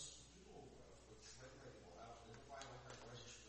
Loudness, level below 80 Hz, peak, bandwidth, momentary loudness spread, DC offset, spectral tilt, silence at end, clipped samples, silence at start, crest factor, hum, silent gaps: -59 LUFS; -70 dBFS; -38 dBFS; 8.4 kHz; 6 LU; under 0.1%; -3 dB/octave; 0 s; under 0.1%; 0 s; 22 dB; none; none